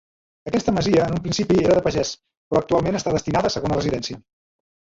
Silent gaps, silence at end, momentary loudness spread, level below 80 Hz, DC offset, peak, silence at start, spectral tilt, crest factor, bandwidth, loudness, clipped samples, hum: 2.37-2.51 s; 0.7 s; 10 LU; -44 dBFS; under 0.1%; -6 dBFS; 0.45 s; -5.5 dB/octave; 16 dB; 8 kHz; -21 LUFS; under 0.1%; none